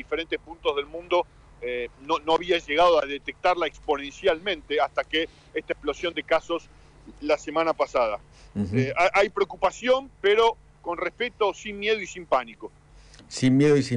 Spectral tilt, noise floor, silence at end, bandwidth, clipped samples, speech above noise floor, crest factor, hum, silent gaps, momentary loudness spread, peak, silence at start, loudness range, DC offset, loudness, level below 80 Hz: -5 dB/octave; -50 dBFS; 0 s; 10.5 kHz; under 0.1%; 25 dB; 14 dB; none; none; 12 LU; -12 dBFS; 0 s; 3 LU; under 0.1%; -25 LUFS; -52 dBFS